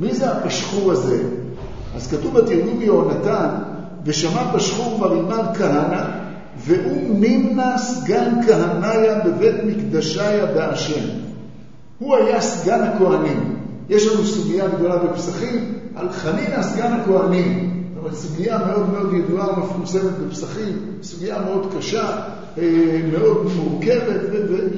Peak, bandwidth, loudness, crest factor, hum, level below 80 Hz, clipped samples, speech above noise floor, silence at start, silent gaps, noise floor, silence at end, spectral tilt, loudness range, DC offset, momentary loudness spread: 0 dBFS; 7.8 kHz; -19 LUFS; 18 dB; none; -48 dBFS; under 0.1%; 24 dB; 0 s; none; -42 dBFS; 0 s; -6 dB/octave; 4 LU; 1%; 11 LU